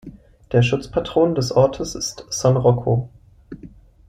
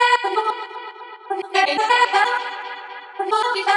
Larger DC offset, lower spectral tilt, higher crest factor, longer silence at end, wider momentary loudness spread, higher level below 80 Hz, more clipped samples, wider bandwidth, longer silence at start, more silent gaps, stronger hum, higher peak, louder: neither; first, -6 dB/octave vs 0 dB/octave; about the same, 16 dB vs 18 dB; first, 0.4 s vs 0 s; about the same, 20 LU vs 18 LU; first, -44 dBFS vs under -90 dBFS; neither; first, 13 kHz vs 11.5 kHz; about the same, 0.05 s vs 0 s; neither; neither; about the same, -4 dBFS vs -4 dBFS; about the same, -19 LUFS vs -19 LUFS